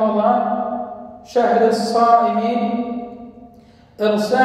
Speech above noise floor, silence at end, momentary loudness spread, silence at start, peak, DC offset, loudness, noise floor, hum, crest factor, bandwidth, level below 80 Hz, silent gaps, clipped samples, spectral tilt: 31 dB; 0 s; 17 LU; 0 s; -2 dBFS; under 0.1%; -18 LUFS; -47 dBFS; none; 16 dB; 13.5 kHz; -58 dBFS; none; under 0.1%; -5.5 dB/octave